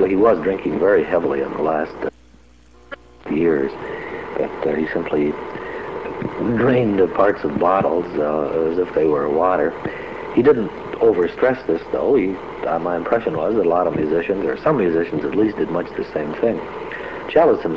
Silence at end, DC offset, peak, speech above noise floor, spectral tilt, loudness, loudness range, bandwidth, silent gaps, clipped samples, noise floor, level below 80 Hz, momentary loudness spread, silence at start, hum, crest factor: 0 s; 0.3%; -2 dBFS; 31 dB; -8.5 dB/octave; -19 LUFS; 4 LU; 6.8 kHz; none; under 0.1%; -49 dBFS; -48 dBFS; 12 LU; 0 s; none; 18 dB